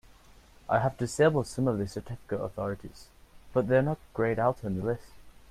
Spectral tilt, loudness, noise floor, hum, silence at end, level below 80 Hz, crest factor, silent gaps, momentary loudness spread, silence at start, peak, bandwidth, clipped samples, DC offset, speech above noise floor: -6.5 dB/octave; -29 LUFS; -56 dBFS; none; 0.2 s; -54 dBFS; 18 dB; none; 12 LU; 0.65 s; -12 dBFS; 14.5 kHz; under 0.1%; under 0.1%; 27 dB